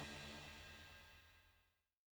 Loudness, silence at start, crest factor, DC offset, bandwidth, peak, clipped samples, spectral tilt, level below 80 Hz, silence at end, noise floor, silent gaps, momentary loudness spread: -56 LUFS; 0 s; 20 dB; under 0.1%; over 20 kHz; -38 dBFS; under 0.1%; -3.5 dB/octave; -70 dBFS; 0.45 s; -81 dBFS; none; 13 LU